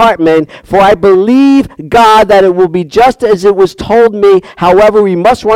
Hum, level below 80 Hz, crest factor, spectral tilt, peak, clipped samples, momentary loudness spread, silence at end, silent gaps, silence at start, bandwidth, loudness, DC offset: none; -36 dBFS; 6 dB; -6 dB/octave; 0 dBFS; 1%; 5 LU; 0 s; none; 0 s; 15 kHz; -7 LUFS; under 0.1%